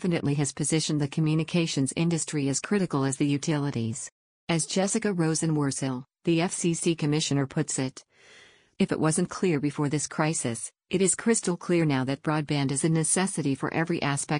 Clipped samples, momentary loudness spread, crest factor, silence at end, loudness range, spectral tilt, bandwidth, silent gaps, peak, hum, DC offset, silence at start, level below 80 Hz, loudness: under 0.1%; 6 LU; 16 dB; 0 s; 2 LU; -5 dB/octave; 10.5 kHz; 4.12-4.47 s; -10 dBFS; none; under 0.1%; 0 s; -62 dBFS; -27 LUFS